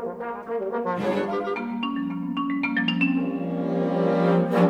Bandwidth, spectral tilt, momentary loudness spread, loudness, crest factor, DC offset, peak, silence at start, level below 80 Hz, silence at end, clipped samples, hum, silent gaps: 7 kHz; -8 dB/octave; 8 LU; -25 LUFS; 16 dB; under 0.1%; -8 dBFS; 0 s; -64 dBFS; 0 s; under 0.1%; none; none